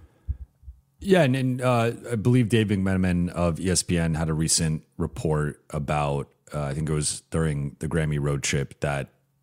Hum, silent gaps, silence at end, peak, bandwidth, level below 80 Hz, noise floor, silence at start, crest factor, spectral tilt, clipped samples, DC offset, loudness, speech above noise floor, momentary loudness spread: none; none; 0.4 s; -6 dBFS; 16 kHz; -42 dBFS; -48 dBFS; 0.3 s; 18 dB; -5 dB/octave; under 0.1%; under 0.1%; -25 LUFS; 24 dB; 11 LU